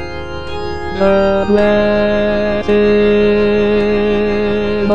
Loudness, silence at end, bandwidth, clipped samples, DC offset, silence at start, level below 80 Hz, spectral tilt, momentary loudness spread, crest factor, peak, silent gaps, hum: -13 LUFS; 0 s; 8 kHz; under 0.1%; 4%; 0 s; -32 dBFS; -7.5 dB/octave; 11 LU; 12 dB; 0 dBFS; none; none